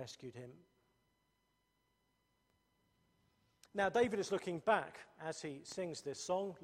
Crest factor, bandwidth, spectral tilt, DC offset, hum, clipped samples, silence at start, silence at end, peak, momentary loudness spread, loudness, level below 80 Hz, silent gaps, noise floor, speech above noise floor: 22 dB; 14.5 kHz; -4 dB/octave; under 0.1%; none; under 0.1%; 0 s; 0 s; -20 dBFS; 16 LU; -39 LUFS; -78 dBFS; none; -81 dBFS; 41 dB